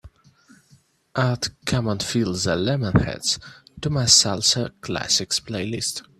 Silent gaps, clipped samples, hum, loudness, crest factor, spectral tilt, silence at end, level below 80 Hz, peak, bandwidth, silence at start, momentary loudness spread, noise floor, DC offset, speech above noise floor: none; under 0.1%; none; -21 LUFS; 22 dB; -3.5 dB/octave; 0.2 s; -46 dBFS; 0 dBFS; 14.5 kHz; 0.05 s; 13 LU; -58 dBFS; under 0.1%; 35 dB